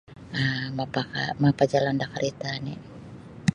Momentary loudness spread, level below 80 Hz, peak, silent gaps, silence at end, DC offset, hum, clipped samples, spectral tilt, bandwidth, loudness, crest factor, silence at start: 18 LU; -56 dBFS; -6 dBFS; none; 0 s; under 0.1%; none; under 0.1%; -6 dB/octave; 11 kHz; -27 LUFS; 20 dB; 0.1 s